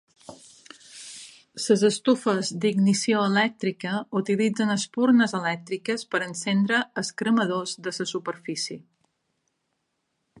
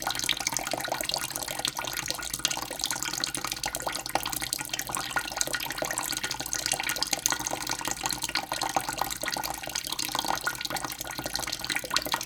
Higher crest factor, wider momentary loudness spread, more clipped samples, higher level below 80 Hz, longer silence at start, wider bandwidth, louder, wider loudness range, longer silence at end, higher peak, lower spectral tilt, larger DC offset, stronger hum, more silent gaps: second, 18 dB vs 30 dB; first, 12 LU vs 4 LU; neither; second, -74 dBFS vs -54 dBFS; first, 0.3 s vs 0 s; second, 11.5 kHz vs over 20 kHz; first, -24 LUFS vs -29 LUFS; first, 5 LU vs 1 LU; first, 1.6 s vs 0 s; second, -8 dBFS vs -2 dBFS; first, -4.5 dB/octave vs -0.5 dB/octave; neither; neither; neither